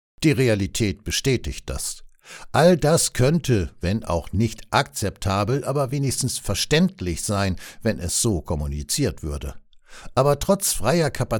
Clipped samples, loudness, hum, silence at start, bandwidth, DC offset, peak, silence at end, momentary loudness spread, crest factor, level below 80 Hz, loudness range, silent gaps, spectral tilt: under 0.1%; -22 LUFS; none; 0.2 s; 19 kHz; under 0.1%; -4 dBFS; 0 s; 10 LU; 18 dB; -38 dBFS; 3 LU; none; -4.5 dB/octave